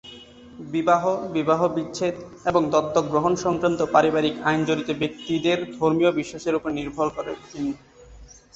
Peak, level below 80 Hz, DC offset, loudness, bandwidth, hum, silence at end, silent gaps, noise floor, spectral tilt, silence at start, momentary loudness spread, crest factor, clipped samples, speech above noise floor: -2 dBFS; -54 dBFS; under 0.1%; -23 LUFS; 8 kHz; none; 0.3 s; none; -47 dBFS; -5.5 dB/octave; 0.05 s; 10 LU; 20 dB; under 0.1%; 24 dB